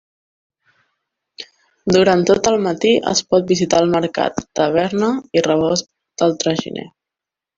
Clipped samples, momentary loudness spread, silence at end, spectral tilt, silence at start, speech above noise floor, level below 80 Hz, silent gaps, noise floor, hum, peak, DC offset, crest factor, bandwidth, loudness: under 0.1%; 16 LU; 0.7 s; -4.5 dB/octave; 1.4 s; 70 dB; -52 dBFS; none; -86 dBFS; none; 0 dBFS; under 0.1%; 18 dB; 7.8 kHz; -16 LUFS